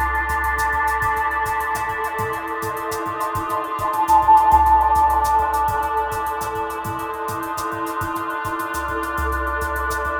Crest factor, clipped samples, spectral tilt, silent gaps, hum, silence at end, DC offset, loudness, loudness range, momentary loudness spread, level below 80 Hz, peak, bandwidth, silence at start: 16 dB; under 0.1%; -4.5 dB/octave; none; none; 0 s; under 0.1%; -20 LUFS; 7 LU; 11 LU; -34 dBFS; -4 dBFS; over 20 kHz; 0 s